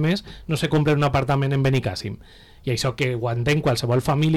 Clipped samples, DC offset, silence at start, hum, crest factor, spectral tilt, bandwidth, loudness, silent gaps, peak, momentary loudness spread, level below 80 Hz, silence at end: under 0.1%; under 0.1%; 0 s; none; 10 dB; -6 dB/octave; 14 kHz; -22 LUFS; none; -12 dBFS; 9 LU; -44 dBFS; 0 s